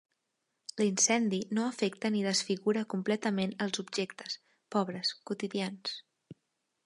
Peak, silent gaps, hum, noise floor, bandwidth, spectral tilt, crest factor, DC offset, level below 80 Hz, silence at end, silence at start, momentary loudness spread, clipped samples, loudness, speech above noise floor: -14 dBFS; none; none; -83 dBFS; 11.5 kHz; -3.5 dB/octave; 20 dB; under 0.1%; -80 dBFS; 0.5 s; 0.75 s; 13 LU; under 0.1%; -32 LUFS; 51 dB